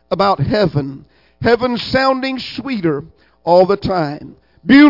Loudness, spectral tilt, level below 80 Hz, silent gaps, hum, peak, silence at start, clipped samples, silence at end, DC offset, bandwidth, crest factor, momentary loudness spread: -16 LUFS; -7.5 dB/octave; -44 dBFS; none; none; 0 dBFS; 0.1 s; under 0.1%; 0 s; under 0.1%; 5.8 kHz; 14 dB; 13 LU